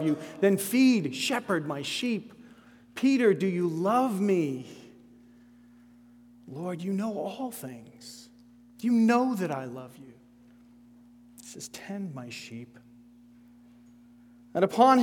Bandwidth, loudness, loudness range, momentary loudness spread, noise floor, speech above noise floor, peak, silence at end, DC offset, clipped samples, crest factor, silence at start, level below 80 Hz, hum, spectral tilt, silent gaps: 18.5 kHz; -27 LUFS; 15 LU; 23 LU; -56 dBFS; 29 dB; -6 dBFS; 0 s; under 0.1%; under 0.1%; 22 dB; 0 s; -74 dBFS; 60 Hz at -50 dBFS; -5.5 dB/octave; none